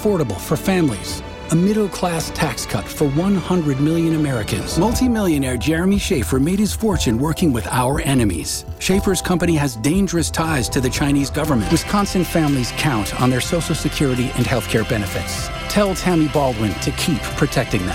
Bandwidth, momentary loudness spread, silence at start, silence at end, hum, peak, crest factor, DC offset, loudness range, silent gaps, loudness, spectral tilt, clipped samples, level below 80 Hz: 16.5 kHz; 4 LU; 0 s; 0 s; none; -4 dBFS; 16 dB; under 0.1%; 1 LU; none; -19 LUFS; -5 dB/octave; under 0.1%; -32 dBFS